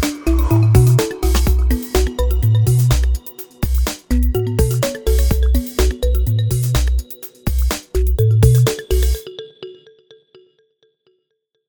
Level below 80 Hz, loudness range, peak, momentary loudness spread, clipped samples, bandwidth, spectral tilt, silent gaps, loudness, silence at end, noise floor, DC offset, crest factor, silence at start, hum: -20 dBFS; 3 LU; 0 dBFS; 12 LU; under 0.1%; over 20 kHz; -6 dB/octave; none; -17 LUFS; 1.95 s; -71 dBFS; under 0.1%; 16 dB; 0 s; none